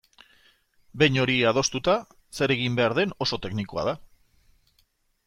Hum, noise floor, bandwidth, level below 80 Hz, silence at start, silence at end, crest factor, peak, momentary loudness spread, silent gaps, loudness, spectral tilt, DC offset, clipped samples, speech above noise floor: none; -68 dBFS; 15 kHz; -54 dBFS; 0.95 s; 1.2 s; 22 dB; -6 dBFS; 10 LU; none; -24 LUFS; -4.5 dB/octave; under 0.1%; under 0.1%; 44 dB